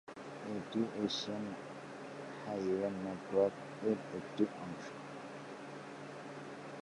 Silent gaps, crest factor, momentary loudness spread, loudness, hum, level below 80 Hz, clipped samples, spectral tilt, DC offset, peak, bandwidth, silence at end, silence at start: none; 20 dB; 12 LU; -40 LUFS; none; -76 dBFS; under 0.1%; -5.5 dB/octave; under 0.1%; -18 dBFS; 11.5 kHz; 0.05 s; 0.05 s